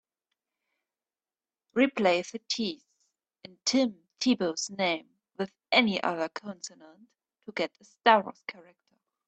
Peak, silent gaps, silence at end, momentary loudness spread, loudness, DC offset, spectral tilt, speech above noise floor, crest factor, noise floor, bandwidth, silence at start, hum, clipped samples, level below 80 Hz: -4 dBFS; none; 0.75 s; 16 LU; -28 LUFS; under 0.1%; -3.5 dB/octave; over 61 dB; 26 dB; under -90 dBFS; 8.8 kHz; 1.75 s; none; under 0.1%; -76 dBFS